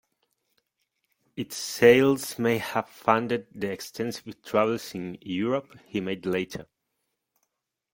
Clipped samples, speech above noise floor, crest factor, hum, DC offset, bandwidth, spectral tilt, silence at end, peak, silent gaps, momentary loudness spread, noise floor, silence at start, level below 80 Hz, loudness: under 0.1%; 54 dB; 24 dB; none; under 0.1%; 17 kHz; -5 dB/octave; 1.3 s; -4 dBFS; none; 16 LU; -80 dBFS; 1.35 s; -64 dBFS; -26 LUFS